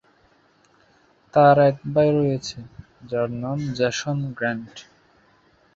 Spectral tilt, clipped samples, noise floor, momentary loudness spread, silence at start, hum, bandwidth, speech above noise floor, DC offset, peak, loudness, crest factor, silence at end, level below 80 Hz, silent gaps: -6 dB/octave; under 0.1%; -59 dBFS; 16 LU; 1.35 s; none; 7.8 kHz; 39 dB; under 0.1%; -2 dBFS; -21 LUFS; 20 dB; 0.95 s; -58 dBFS; none